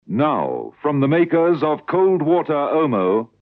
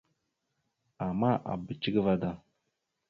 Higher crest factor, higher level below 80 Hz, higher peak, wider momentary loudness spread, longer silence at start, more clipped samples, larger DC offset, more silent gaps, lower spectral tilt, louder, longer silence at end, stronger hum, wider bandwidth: second, 14 dB vs 20 dB; second, -70 dBFS vs -60 dBFS; first, -4 dBFS vs -14 dBFS; second, 6 LU vs 10 LU; second, 0.1 s vs 1 s; neither; neither; neither; first, -10.5 dB/octave vs -9 dB/octave; first, -18 LUFS vs -31 LUFS; second, 0.15 s vs 0.7 s; neither; second, 4.7 kHz vs 5.6 kHz